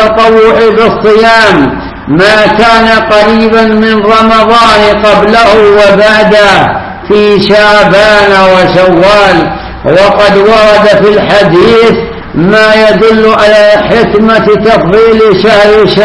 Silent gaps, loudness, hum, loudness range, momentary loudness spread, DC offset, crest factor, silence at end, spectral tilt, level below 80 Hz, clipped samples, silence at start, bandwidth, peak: none; -3 LUFS; none; 1 LU; 4 LU; under 0.1%; 4 dB; 0 s; -5.5 dB/octave; -28 dBFS; 10%; 0 s; 11 kHz; 0 dBFS